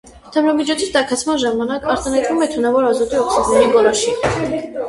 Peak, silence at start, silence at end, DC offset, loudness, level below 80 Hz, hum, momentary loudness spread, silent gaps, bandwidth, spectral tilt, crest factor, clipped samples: 0 dBFS; 0.05 s; 0 s; under 0.1%; -16 LUFS; -42 dBFS; none; 6 LU; none; 11.5 kHz; -3.5 dB/octave; 16 dB; under 0.1%